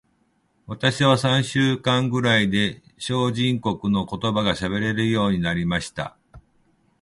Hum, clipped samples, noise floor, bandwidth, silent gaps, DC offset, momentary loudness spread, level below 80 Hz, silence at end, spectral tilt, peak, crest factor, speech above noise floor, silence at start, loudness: none; under 0.1%; -66 dBFS; 11.5 kHz; none; under 0.1%; 8 LU; -48 dBFS; 0.6 s; -5.5 dB/octave; -4 dBFS; 18 dB; 44 dB; 0.7 s; -22 LUFS